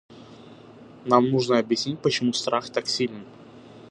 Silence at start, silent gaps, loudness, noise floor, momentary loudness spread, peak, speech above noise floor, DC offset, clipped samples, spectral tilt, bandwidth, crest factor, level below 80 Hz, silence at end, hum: 0.1 s; none; -23 LUFS; -47 dBFS; 8 LU; -2 dBFS; 23 dB; under 0.1%; under 0.1%; -4.5 dB/octave; 11 kHz; 22 dB; -68 dBFS; 0.1 s; none